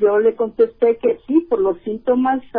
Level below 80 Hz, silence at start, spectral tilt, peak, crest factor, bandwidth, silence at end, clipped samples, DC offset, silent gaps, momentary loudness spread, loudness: -52 dBFS; 0 s; -10.5 dB/octave; -6 dBFS; 12 dB; 3.7 kHz; 0 s; under 0.1%; under 0.1%; none; 4 LU; -18 LUFS